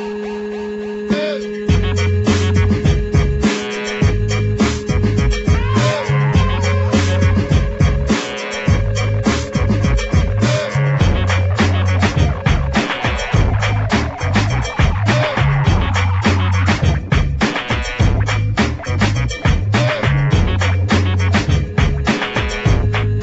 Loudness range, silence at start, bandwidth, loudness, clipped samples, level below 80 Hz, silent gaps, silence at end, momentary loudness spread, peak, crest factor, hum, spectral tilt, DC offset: 1 LU; 0 s; 8.2 kHz; -16 LUFS; under 0.1%; -22 dBFS; none; 0 s; 4 LU; 0 dBFS; 14 dB; none; -6 dB/octave; under 0.1%